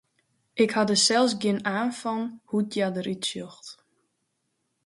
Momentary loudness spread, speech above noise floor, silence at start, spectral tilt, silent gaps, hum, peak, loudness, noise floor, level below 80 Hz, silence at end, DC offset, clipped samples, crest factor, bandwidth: 18 LU; 51 dB; 0.55 s; -3.5 dB/octave; none; none; -8 dBFS; -25 LUFS; -76 dBFS; -72 dBFS; 1.15 s; under 0.1%; under 0.1%; 18 dB; 11.5 kHz